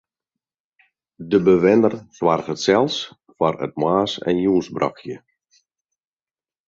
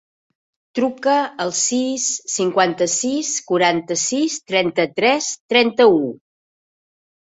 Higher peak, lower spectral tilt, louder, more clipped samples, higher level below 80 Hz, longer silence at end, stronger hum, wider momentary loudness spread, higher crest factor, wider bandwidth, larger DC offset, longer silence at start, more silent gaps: about the same, -2 dBFS vs -2 dBFS; first, -6 dB/octave vs -2.5 dB/octave; about the same, -19 LUFS vs -18 LUFS; neither; first, -56 dBFS vs -66 dBFS; first, 1.5 s vs 1.05 s; neither; first, 18 LU vs 7 LU; about the same, 18 dB vs 18 dB; second, 7.6 kHz vs 8.4 kHz; neither; first, 1.2 s vs 0.75 s; second, none vs 5.40-5.49 s